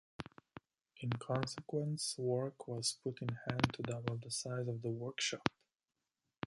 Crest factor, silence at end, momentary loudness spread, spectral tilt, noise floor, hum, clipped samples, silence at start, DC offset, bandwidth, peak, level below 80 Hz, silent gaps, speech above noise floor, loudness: 30 dB; 0.95 s; 13 LU; -4.5 dB/octave; -90 dBFS; none; under 0.1%; 0.2 s; under 0.1%; 11.5 kHz; -10 dBFS; -66 dBFS; none; 50 dB; -40 LUFS